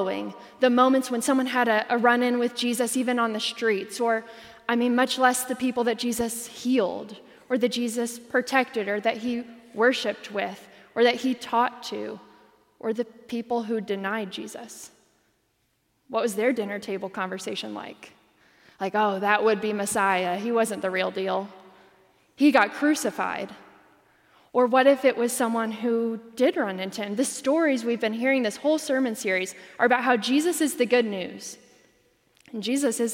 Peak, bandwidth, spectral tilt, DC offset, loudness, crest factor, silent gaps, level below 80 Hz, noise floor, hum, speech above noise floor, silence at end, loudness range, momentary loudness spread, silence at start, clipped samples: -6 dBFS; 16.5 kHz; -3.5 dB/octave; under 0.1%; -25 LUFS; 20 dB; none; -72 dBFS; -71 dBFS; none; 46 dB; 0 s; 7 LU; 13 LU; 0 s; under 0.1%